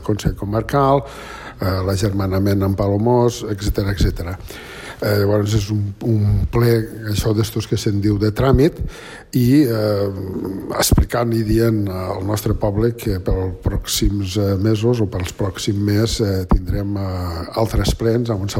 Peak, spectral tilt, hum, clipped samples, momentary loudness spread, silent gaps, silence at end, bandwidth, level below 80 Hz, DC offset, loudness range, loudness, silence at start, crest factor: -4 dBFS; -6 dB/octave; none; under 0.1%; 8 LU; none; 0 s; 16.5 kHz; -28 dBFS; under 0.1%; 2 LU; -19 LUFS; 0 s; 14 dB